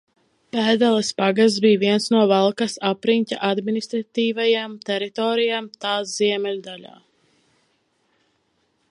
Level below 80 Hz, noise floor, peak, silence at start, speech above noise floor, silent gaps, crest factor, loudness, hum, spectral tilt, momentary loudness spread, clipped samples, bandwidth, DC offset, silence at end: -72 dBFS; -68 dBFS; -4 dBFS; 0.55 s; 47 dB; none; 18 dB; -20 LUFS; none; -4.5 dB/octave; 9 LU; under 0.1%; 11 kHz; under 0.1%; 2.05 s